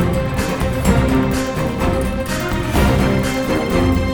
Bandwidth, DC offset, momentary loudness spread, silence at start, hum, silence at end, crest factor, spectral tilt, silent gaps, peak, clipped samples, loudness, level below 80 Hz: over 20 kHz; under 0.1%; 5 LU; 0 s; none; 0 s; 16 dB; -6 dB/octave; none; -2 dBFS; under 0.1%; -18 LUFS; -24 dBFS